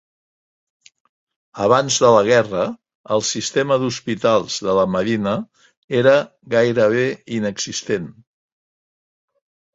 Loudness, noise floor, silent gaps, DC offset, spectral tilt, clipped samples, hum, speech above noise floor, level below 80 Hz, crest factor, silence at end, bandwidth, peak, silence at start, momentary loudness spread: -18 LUFS; under -90 dBFS; 2.95-3.04 s, 5.77-5.88 s; under 0.1%; -4 dB/octave; under 0.1%; none; over 72 dB; -56 dBFS; 18 dB; 1.65 s; 8 kHz; -2 dBFS; 1.55 s; 11 LU